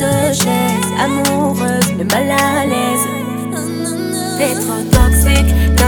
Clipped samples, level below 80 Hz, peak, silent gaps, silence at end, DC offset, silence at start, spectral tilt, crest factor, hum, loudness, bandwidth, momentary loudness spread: under 0.1%; -20 dBFS; 0 dBFS; none; 0 s; under 0.1%; 0 s; -4.5 dB/octave; 14 dB; none; -14 LUFS; over 20 kHz; 8 LU